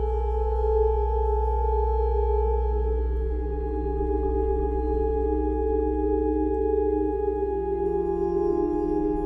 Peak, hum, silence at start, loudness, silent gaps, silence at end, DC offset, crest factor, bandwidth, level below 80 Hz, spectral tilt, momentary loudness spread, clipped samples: -12 dBFS; none; 0 s; -26 LUFS; none; 0 s; under 0.1%; 12 dB; 3.2 kHz; -28 dBFS; -11.5 dB/octave; 3 LU; under 0.1%